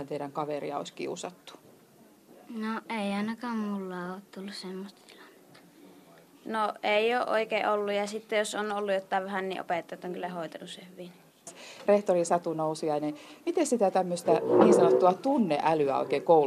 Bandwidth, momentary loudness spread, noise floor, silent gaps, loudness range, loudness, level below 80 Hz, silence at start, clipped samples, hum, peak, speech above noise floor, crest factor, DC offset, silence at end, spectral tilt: 14.5 kHz; 18 LU; -58 dBFS; none; 11 LU; -28 LUFS; -78 dBFS; 0 s; under 0.1%; none; -8 dBFS; 30 dB; 22 dB; under 0.1%; 0 s; -5 dB/octave